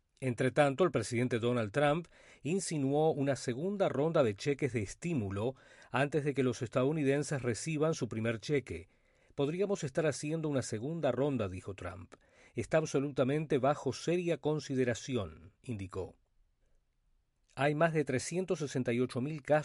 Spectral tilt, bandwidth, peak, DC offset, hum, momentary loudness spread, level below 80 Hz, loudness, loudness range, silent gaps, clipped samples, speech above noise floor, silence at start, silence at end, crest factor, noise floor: -6 dB/octave; 11.5 kHz; -14 dBFS; under 0.1%; none; 12 LU; -66 dBFS; -34 LUFS; 4 LU; none; under 0.1%; 41 dB; 0.2 s; 0 s; 20 dB; -74 dBFS